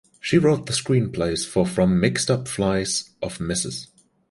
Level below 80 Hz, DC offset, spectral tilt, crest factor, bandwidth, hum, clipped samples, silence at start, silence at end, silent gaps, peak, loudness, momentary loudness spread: -46 dBFS; under 0.1%; -5 dB/octave; 20 dB; 11.5 kHz; none; under 0.1%; 0.25 s; 0.45 s; none; -4 dBFS; -22 LUFS; 8 LU